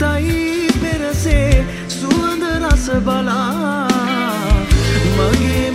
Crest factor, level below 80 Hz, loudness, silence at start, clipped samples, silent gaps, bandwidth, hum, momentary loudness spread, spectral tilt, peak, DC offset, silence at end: 14 dB; -20 dBFS; -16 LUFS; 0 s; under 0.1%; none; 16 kHz; none; 4 LU; -5.5 dB/octave; 0 dBFS; under 0.1%; 0 s